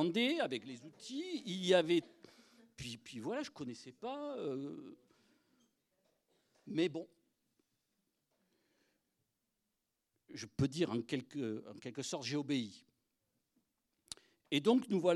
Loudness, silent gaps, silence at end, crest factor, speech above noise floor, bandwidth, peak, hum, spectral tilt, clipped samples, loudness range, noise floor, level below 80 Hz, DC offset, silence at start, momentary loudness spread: -38 LUFS; none; 0 s; 24 dB; 50 dB; 13 kHz; -16 dBFS; none; -5 dB/octave; under 0.1%; 8 LU; -87 dBFS; -76 dBFS; under 0.1%; 0 s; 19 LU